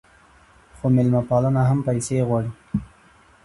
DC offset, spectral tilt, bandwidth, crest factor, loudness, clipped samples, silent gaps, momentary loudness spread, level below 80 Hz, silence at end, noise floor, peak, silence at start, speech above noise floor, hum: under 0.1%; -8 dB/octave; 11.5 kHz; 16 dB; -21 LUFS; under 0.1%; none; 10 LU; -48 dBFS; 0.6 s; -53 dBFS; -6 dBFS; 0.75 s; 33 dB; none